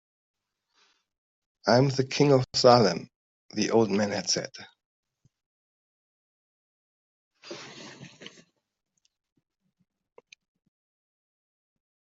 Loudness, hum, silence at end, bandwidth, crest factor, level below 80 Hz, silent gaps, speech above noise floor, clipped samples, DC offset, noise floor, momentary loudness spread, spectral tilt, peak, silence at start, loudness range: -24 LUFS; none; 3.85 s; 8 kHz; 24 dB; -68 dBFS; 3.16-3.49 s, 4.85-5.03 s, 5.46-7.31 s; 47 dB; under 0.1%; under 0.1%; -71 dBFS; 25 LU; -5 dB/octave; -4 dBFS; 1.65 s; 24 LU